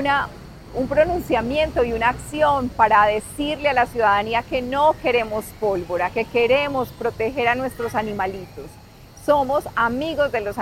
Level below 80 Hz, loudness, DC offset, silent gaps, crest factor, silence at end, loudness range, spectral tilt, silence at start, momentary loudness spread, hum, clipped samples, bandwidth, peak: -42 dBFS; -21 LUFS; under 0.1%; none; 18 dB; 0 s; 4 LU; -5 dB/octave; 0 s; 9 LU; none; under 0.1%; 16.5 kHz; -4 dBFS